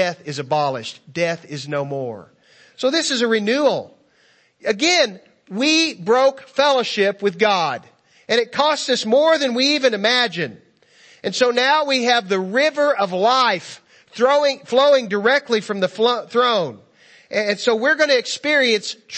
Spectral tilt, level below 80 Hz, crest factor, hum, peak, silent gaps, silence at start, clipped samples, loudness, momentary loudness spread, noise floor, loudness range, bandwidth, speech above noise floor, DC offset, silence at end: -3 dB/octave; -72 dBFS; 18 dB; none; -2 dBFS; none; 0 s; under 0.1%; -18 LUFS; 11 LU; -57 dBFS; 4 LU; 8.8 kHz; 39 dB; under 0.1%; 0 s